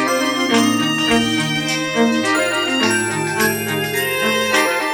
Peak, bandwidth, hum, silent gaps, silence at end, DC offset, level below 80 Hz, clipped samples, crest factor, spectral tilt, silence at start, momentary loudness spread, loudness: -2 dBFS; over 20 kHz; none; none; 0 s; under 0.1%; -52 dBFS; under 0.1%; 14 dB; -3 dB/octave; 0 s; 3 LU; -16 LUFS